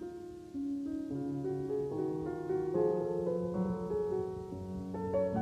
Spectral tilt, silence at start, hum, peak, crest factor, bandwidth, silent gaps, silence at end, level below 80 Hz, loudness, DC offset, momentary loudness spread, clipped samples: -9.5 dB/octave; 0 s; none; -20 dBFS; 16 dB; 11 kHz; none; 0 s; -60 dBFS; -36 LUFS; under 0.1%; 9 LU; under 0.1%